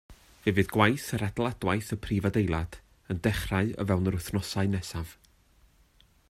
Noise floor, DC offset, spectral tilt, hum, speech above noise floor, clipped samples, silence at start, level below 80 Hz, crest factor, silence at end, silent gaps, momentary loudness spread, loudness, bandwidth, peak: -62 dBFS; under 0.1%; -6 dB/octave; none; 34 dB; under 0.1%; 0.1 s; -48 dBFS; 22 dB; 1.15 s; none; 9 LU; -29 LUFS; 14.5 kHz; -6 dBFS